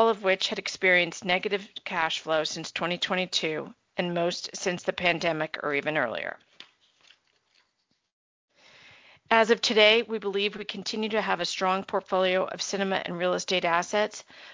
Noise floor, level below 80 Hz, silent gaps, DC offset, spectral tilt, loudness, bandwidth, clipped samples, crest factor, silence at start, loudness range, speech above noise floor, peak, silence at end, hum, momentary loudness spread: -75 dBFS; -70 dBFS; 8.13-8.48 s; under 0.1%; -3 dB/octave; -26 LUFS; 7.8 kHz; under 0.1%; 22 dB; 0 s; 8 LU; 48 dB; -6 dBFS; 0 s; none; 10 LU